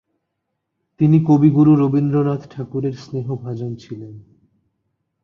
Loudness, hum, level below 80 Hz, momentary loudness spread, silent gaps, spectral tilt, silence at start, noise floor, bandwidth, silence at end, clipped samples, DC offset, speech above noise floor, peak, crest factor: -17 LUFS; none; -58 dBFS; 19 LU; none; -10.5 dB/octave; 1 s; -76 dBFS; 6.6 kHz; 1.05 s; under 0.1%; under 0.1%; 59 dB; -2 dBFS; 16 dB